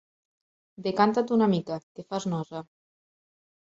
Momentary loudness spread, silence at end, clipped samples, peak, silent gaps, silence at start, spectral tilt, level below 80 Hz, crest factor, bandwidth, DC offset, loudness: 14 LU; 1.05 s; under 0.1%; -6 dBFS; 1.83-1.95 s; 0.8 s; -6.5 dB/octave; -70 dBFS; 22 dB; 7.8 kHz; under 0.1%; -27 LUFS